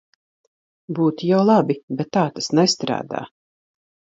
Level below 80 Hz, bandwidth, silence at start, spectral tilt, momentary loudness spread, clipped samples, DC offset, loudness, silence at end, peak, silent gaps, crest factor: -68 dBFS; 8 kHz; 0.9 s; -5.5 dB/octave; 15 LU; under 0.1%; under 0.1%; -20 LUFS; 0.9 s; -2 dBFS; 1.83-1.88 s; 18 dB